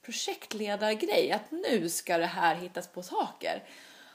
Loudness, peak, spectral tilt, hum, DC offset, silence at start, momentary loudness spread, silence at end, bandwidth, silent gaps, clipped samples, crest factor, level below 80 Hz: -31 LUFS; -10 dBFS; -3 dB/octave; none; under 0.1%; 0.05 s; 12 LU; 0.05 s; 15.5 kHz; none; under 0.1%; 20 dB; -88 dBFS